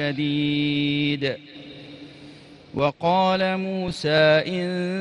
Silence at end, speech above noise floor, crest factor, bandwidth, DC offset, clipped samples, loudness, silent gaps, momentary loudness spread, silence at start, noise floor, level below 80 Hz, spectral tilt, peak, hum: 0 s; 23 dB; 16 dB; 11 kHz; under 0.1%; under 0.1%; -22 LUFS; none; 22 LU; 0 s; -45 dBFS; -56 dBFS; -6.5 dB/octave; -6 dBFS; none